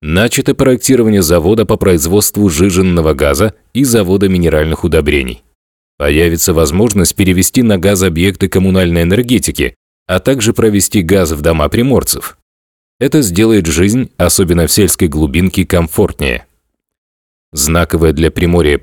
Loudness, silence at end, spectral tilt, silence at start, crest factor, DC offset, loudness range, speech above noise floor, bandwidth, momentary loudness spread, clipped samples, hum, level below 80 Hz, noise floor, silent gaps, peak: -11 LUFS; 0.05 s; -5 dB/octave; 0 s; 10 dB; 0.1%; 2 LU; 53 dB; 19 kHz; 5 LU; under 0.1%; none; -26 dBFS; -63 dBFS; 5.55-5.98 s, 9.76-10.06 s, 12.42-12.99 s, 16.98-17.52 s; 0 dBFS